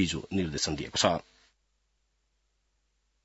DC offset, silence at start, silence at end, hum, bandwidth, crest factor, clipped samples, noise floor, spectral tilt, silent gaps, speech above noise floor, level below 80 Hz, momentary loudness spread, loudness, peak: under 0.1%; 0 s; 2.05 s; none; 8 kHz; 26 dB; under 0.1%; -75 dBFS; -3.5 dB/octave; none; 45 dB; -56 dBFS; 5 LU; -29 LUFS; -6 dBFS